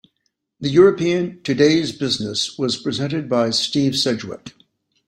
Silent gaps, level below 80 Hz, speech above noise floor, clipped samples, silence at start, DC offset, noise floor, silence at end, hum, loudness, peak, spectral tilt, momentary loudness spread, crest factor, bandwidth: none; -58 dBFS; 54 dB; under 0.1%; 0.6 s; under 0.1%; -72 dBFS; 0.6 s; none; -19 LUFS; -2 dBFS; -5 dB/octave; 9 LU; 18 dB; 13 kHz